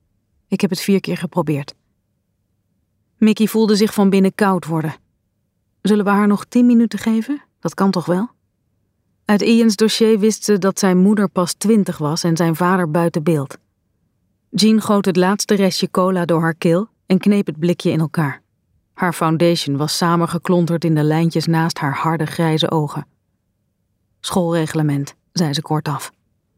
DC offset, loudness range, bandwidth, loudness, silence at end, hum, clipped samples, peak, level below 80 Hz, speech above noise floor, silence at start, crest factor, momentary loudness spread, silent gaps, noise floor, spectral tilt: under 0.1%; 5 LU; 16 kHz; -17 LUFS; 0.5 s; none; under 0.1%; -2 dBFS; -62 dBFS; 52 dB; 0.5 s; 14 dB; 9 LU; none; -68 dBFS; -6 dB/octave